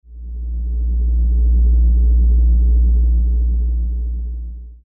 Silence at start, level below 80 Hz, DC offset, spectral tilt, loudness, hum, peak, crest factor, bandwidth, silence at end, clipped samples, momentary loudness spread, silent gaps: 0.1 s; -14 dBFS; under 0.1%; -17 dB/octave; -17 LUFS; none; -8 dBFS; 6 dB; 0.7 kHz; 0.1 s; under 0.1%; 13 LU; none